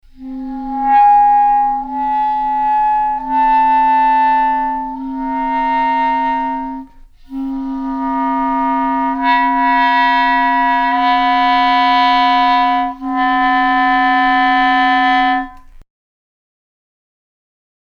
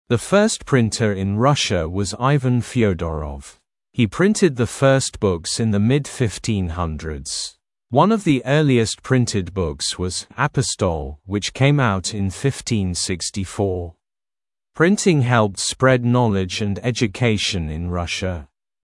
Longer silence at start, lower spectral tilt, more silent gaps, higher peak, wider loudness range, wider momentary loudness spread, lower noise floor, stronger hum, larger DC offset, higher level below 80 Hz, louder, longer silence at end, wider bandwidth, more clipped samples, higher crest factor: about the same, 0.2 s vs 0.1 s; about the same, -4 dB/octave vs -5 dB/octave; neither; second, -4 dBFS vs 0 dBFS; first, 6 LU vs 3 LU; about the same, 10 LU vs 9 LU; second, -38 dBFS vs under -90 dBFS; neither; neither; about the same, -40 dBFS vs -42 dBFS; first, -14 LUFS vs -20 LUFS; first, 2.05 s vs 0.4 s; second, 6.8 kHz vs 12 kHz; neither; second, 12 dB vs 18 dB